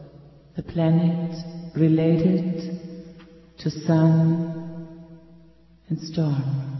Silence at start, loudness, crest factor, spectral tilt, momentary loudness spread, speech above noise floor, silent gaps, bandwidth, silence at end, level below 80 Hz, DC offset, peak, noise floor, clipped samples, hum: 0 s; -23 LUFS; 16 dB; -9 dB/octave; 19 LU; 32 dB; none; 6 kHz; 0 s; -54 dBFS; under 0.1%; -8 dBFS; -53 dBFS; under 0.1%; none